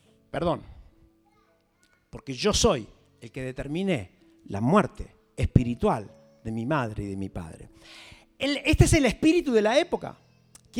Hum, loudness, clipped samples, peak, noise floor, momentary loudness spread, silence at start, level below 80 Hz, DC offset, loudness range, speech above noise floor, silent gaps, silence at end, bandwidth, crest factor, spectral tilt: none; -26 LUFS; under 0.1%; -2 dBFS; -66 dBFS; 22 LU; 0.35 s; -40 dBFS; under 0.1%; 5 LU; 41 dB; none; 0 s; 16.5 kHz; 26 dB; -5.5 dB/octave